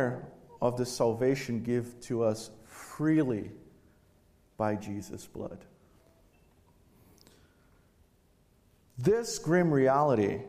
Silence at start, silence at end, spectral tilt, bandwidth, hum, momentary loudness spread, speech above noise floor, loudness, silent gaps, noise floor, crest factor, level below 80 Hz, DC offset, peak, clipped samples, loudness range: 0 s; 0 s; -6.5 dB/octave; 15 kHz; none; 20 LU; 36 dB; -30 LUFS; none; -66 dBFS; 18 dB; -64 dBFS; under 0.1%; -14 dBFS; under 0.1%; 14 LU